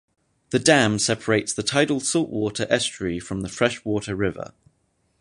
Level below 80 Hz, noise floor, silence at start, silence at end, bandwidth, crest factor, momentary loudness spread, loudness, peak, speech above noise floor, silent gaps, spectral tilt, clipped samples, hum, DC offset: -52 dBFS; -68 dBFS; 0.5 s; 0.75 s; 11.5 kHz; 22 dB; 11 LU; -22 LUFS; -2 dBFS; 46 dB; none; -3.5 dB/octave; under 0.1%; none; under 0.1%